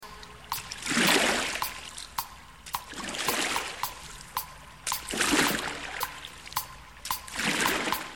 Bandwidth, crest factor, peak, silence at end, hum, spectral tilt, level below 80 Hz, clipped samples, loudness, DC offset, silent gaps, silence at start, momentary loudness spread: 17.5 kHz; 24 dB; -8 dBFS; 0 s; none; -1.5 dB/octave; -54 dBFS; under 0.1%; -29 LUFS; 0.1%; none; 0 s; 18 LU